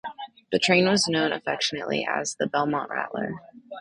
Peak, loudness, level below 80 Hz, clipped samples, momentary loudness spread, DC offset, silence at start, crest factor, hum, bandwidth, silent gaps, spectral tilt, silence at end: -6 dBFS; -24 LUFS; -64 dBFS; under 0.1%; 17 LU; under 0.1%; 0.05 s; 20 dB; none; 11 kHz; none; -3.5 dB/octave; 0 s